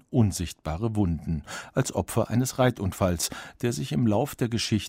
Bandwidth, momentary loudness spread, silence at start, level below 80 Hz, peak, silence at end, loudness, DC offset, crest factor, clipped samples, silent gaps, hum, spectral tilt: 16 kHz; 7 LU; 0.1 s; -44 dBFS; -10 dBFS; 0 s; -27 LUFS; under 0.1%; 16 dB; under 0.1%; none; none; -5.5 dB/octave